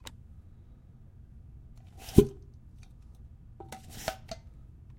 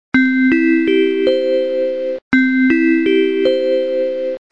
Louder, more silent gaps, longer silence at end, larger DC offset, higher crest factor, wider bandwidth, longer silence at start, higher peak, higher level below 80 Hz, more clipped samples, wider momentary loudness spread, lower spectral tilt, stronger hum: second, -29 LUFS vs -15 LUFS; second, none vs 2.22-2.31 s; first, 0.65 s vs 0.15 s; second, under 0.1% vs 0.6%; first, 32 dB vs 10 dB; first, 16.5 kHz vs 6.8 kHz; about the same, 0.05 s vs 0.15 s; about the same, -4 dBFS vs -4 dBFS; first, -46 dBFS vs -54 dBFS; neither; first, 29 LU vs 6 LU; about the same, -7 dB/octave vs -6 dB/octave; neither